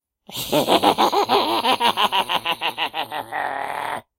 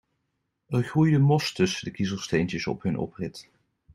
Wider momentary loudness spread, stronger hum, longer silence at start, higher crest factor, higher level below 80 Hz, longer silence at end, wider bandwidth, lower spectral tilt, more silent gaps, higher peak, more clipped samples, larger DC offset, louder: second, 10 LU vs 13 LU; neither; second, 0.3 s vs 0.7 s; about the same, 22 dB vs 18 dB; about the same, -58 dBFS vs -58 dBFS; second, 0.2 s vs 0.5 s; first, 16.5 kHz vs 12.5 kHz; second, -3 dB/octave vs -6 dB/octave; neither; first, 0 dBFS vs -8 dBFS; neither; neither; first, -20 LUFS vs -26 LUFS